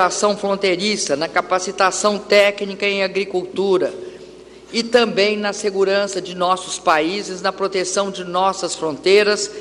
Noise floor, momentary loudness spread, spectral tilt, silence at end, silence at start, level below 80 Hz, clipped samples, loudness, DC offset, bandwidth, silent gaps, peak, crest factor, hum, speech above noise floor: -40 dBFS; 8 LU; -3 dB/octave; 0 s; 0 s; -58 dBFS; under 0.1%; -18 LUFS; under 0.1%; 12 kHz; none; -2 dBFS; 16 dB; none; 22 dB